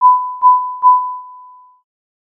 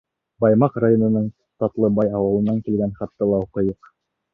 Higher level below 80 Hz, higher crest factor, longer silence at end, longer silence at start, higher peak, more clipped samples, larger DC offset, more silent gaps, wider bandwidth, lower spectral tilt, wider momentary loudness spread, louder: second, -86 dBFS vs -50 dBFS; about the same, 12 dB vs 16 dB; first, 0.85 s vs 0.6 s; second, 0 s vs 0.4 s; about the same, -2 dBFS vs -4 dBFS; neither; neither; neither; second, 1.3 kHz vs 3.4 kHz; second, -1.5 dB/octave vs -12.5 dB/octave; first, 12 LU vs 9 LU; first, -12 LUFS vs -20 LUFS